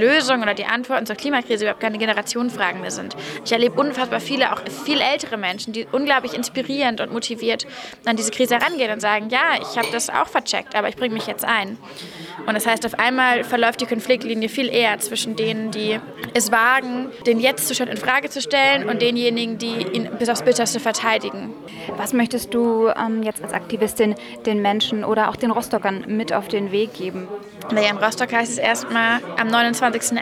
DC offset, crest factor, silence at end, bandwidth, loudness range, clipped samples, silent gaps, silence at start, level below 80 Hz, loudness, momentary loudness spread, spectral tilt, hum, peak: under 0.1%; 16 dB; 0 s; 17.5 kHz; 2 LU; under 0.1%; none; 0 s; -62 dBFS; -20 LUFS; 8 LU; -3 dB/octave; none; -4 dBFS